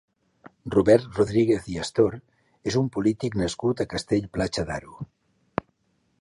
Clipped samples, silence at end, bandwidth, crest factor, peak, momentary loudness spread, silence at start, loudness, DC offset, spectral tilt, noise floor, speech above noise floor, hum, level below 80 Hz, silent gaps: under 0.1%; 1.15 s; 11.5 kHz; 20 dB; -4 dBFS; 14 LU; 0.65 s; -25 LUFS; under 0.1%; -6 dB/octave; -70 dBFS; 46 dB; none; -48 dBFS; none